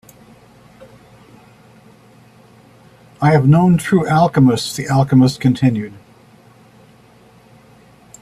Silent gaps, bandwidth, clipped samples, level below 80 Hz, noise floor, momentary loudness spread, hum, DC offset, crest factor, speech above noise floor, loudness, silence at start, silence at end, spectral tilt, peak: none; 14.5 kHz; under 0.1%; -50 dBFS; -47 dBFS; 7 LU; none; under 0.1%; 16 dB; 34 dB; -14 LUFS; 3.2 s; 2.3 s; -7 dB/octave; -2 dBFS